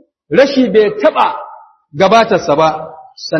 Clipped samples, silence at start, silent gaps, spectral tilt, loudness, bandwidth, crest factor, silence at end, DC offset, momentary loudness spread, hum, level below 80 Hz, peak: 0.2%; 0.3 s; none; -5.5 dB/octave; -11 LUFS; 7.8 kHz; 12 dB; 0 s; under 0.1%; 17 LU; none; -52 dBFS; 0 dBFS